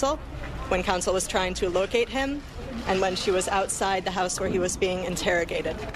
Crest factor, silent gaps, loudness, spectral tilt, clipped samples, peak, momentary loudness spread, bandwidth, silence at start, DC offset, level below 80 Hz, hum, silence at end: 16 dB; none; -26 LUFS; -3.5 dB/octave; under 0.1%; -10 dBFS; 7 LU; 14 kHz; 0 s; under 0.1%; -40 dBFS; none; 0 s